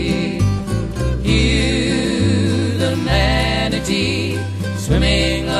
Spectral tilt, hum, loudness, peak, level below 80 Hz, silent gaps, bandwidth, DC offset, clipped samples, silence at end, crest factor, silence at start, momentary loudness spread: -5.5 dB/octave; none; -17 LUFS; -2 dBFS; -24 dBFS; none; 13 kHz; under 0.1%; under 0.1%; 0 s; 16 dB; 0 s; 6 LU